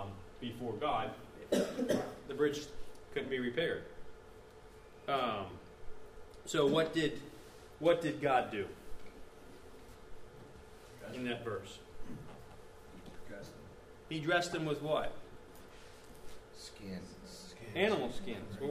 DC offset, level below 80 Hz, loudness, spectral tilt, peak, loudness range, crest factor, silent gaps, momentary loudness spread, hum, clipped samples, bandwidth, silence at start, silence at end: under 0.1%; -58 dBFS; -36 LUFS; -5 dB/octave; -18 dBFS; 12 LU; 22 dB; none; 23 LU; none; under 0.1%; 15.5 kHz; 0 s; 0 s